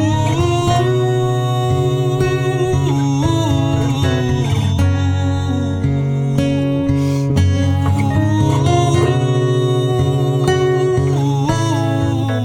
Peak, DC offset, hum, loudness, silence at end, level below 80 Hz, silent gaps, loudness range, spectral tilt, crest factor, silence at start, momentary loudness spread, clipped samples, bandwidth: -2 dBFS; under 0.1%; none; -16 LUFS; 0 s; -36 dBFS; none; 2 LU; -7 dB/octave; 14 dB; 0 s; 2 LU; under 0.1%; 12.5 kHz